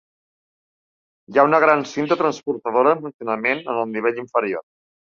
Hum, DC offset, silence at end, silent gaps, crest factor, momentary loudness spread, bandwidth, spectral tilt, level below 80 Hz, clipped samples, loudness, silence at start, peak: none; under 0.1%; 0.45 s; 3.14-3.19 s; 20 dB; 10 LU; 7.4 kHz; -5.5 dB/octave; -68 dBFS; under 0.1%; -20 LUFS; 1.3 s; 0 dBFS